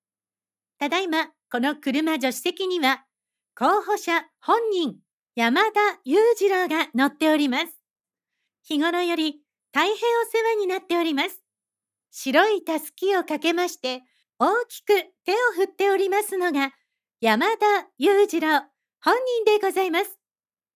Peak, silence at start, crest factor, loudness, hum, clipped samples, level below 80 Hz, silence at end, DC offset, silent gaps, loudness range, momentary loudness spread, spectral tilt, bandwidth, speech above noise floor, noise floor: -2 dBFS; 0.8 s; 20 dB; -23 LUFS; none; under 0.1%; -88 dBFS; 0.6 s; under 0.1%; 5.13-5.20 s; 3 LU; 7 LU; -2.5 dB/octave; 16 kHz; over 68 dB; under -90 dBFS